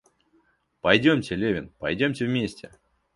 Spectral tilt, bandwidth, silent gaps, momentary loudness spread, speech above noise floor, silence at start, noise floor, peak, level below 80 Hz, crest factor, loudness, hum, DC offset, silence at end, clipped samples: -6 dB/octave; 11.5 kHz; none; 11 LU; 42 dB; 0.85 s; -66 dBFS; -4 dBFS; -54 dBFS; 22 dB; -24 LUFS; none; under 0.1%; 0.5 s; under 0.1%